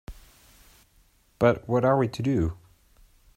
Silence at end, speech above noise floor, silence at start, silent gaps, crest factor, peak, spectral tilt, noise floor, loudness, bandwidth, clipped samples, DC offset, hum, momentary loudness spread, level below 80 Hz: 0.8 s; 39 dB; 0.1 s; none; 20 dB; -8 dBFS; -8 dB/octave; -62 dBFS; -25 LUFS; 16 kHz; under 0.1%; under 0.1%; none; 7 LU; -50 dBFS